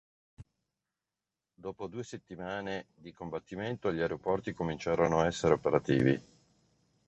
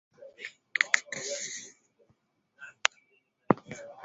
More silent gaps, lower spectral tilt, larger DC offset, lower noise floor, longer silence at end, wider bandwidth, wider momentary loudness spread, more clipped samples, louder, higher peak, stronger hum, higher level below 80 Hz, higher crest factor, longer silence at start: neither; first, -6.5 dB/octave vs -2 dB/octave; neither; first, under -90 dBFS vs -72 dBFS; first, 0.85 s vs 0 s; about the same, 8.4 kHz vs 8 kHz; second, 15 LU vs 21 LU; neither; about the same, -32 LUFS vs -30 LUFS; second, -10 dBFS vs 0 dBFS; neither; first, -58 dBFS vs -72 dBFS; second, 24 dB vs 34 dB; first, 0.4 s vs 0.2 s